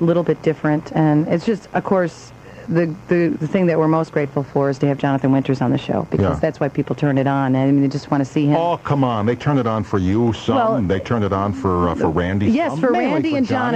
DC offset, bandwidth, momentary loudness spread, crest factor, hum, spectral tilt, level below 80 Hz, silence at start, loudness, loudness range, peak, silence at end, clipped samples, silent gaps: under 0.1%; 8.6 kHz; 4 LU; 14 dB; none; -8 dB/octave; -46 dBFS; 0 s; -18 LUFS; 1 LU; -4 dBFS; 0 s; under 0.1%; none